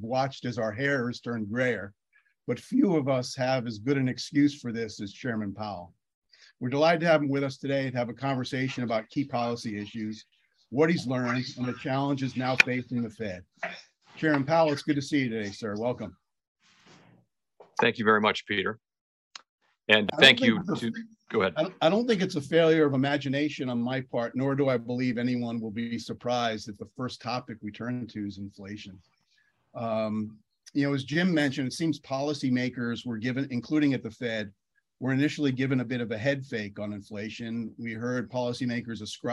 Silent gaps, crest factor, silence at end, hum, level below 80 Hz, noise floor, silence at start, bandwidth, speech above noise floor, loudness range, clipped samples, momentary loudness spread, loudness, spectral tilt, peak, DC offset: 6.14-6.22 s, 16.48-16.55 s, 19.01-19.31 s, 19.49-19.58 s; 24 dB; 0 s; none; -70 dBFS; -70 dBFS; 0 s; 12 kHz; 42 dB; 9 LU; under 0.1%; 14 LU; -28 LUFS; -5.5 dB/octave; -4 dBFS; under 0.1%